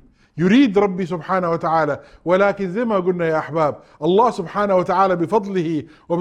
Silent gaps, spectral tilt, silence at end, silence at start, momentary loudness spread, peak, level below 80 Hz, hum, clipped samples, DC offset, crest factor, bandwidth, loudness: none; -7.5 dB/octave; 0 s; 0.35 s; 8 LU; -2 dBFS; -54 dBFS; none; under 0.1%; under 0.1%; 16 dB; 10 kHz; -19 LUFS